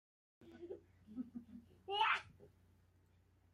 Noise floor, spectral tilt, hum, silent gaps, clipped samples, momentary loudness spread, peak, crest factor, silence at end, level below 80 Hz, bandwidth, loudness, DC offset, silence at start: -72 dBFS; -3.5 dB/octave; none; none; under 0.1%; 24 LU; -24 dBFS; 22 dB; 1.05 s; -78 dBFS; 13 kHz; -40 LUFS; under 0.1%; 0.4 s